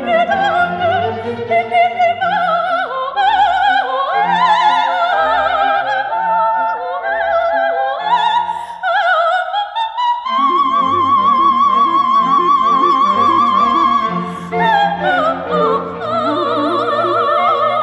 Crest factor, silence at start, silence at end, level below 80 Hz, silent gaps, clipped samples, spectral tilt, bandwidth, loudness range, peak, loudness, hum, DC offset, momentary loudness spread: 12 dB; 0 s; 0 s; -52 dBFS; none; under 0.1%; -5 dB/octave; 10 kHz; 4 LU; -2 dBFS; -14 LUFS; none; under 0.1%; 6 LU